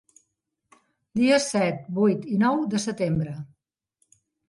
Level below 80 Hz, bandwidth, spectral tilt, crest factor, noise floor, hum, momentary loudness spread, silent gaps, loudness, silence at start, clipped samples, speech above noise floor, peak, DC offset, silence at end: -60 dBFS; 11.5 kHz; -5.5 dB/octave; 16 dB; -78 dBFS; none; 12 LU; none; -24 LUFS; 1.15 s; under 0.1%; 55 dB; -8 dBFS; under 0.1%; 1.05 s